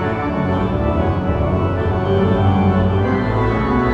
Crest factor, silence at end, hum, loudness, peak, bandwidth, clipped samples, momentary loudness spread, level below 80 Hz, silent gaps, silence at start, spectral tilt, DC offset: 12 dB; 0 s; none; -17 LUFS; -4 dBFS; 5.8 kHz; under 0.1%; 4 LU; -28 dBFS; none; 0 s; -9.5 dB/octave; under 0.1%